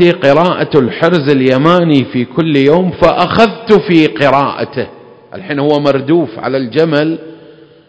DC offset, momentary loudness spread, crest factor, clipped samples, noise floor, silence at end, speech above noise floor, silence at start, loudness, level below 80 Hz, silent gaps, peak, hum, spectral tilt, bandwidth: under 0.1%; 9 LU; 10 dB; 1%; -38 dBFS; 0.55 s; 28 dB; 0 s; -11 LUFS; -44 dBFS; none; 0 dBFS; none; -7.5 dB/octave; 8 kHz